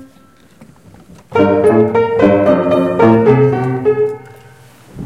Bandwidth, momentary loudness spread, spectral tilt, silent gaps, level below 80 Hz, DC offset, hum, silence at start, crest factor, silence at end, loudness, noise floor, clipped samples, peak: 11 kHz; 7 LU; -8.5 dB/octave; none; -48 dBFS; 0.2%; none; 0 s; 14 dB; 0 s; -12 LUFS; -46 dBFS; under 0.1%; 0 dBFS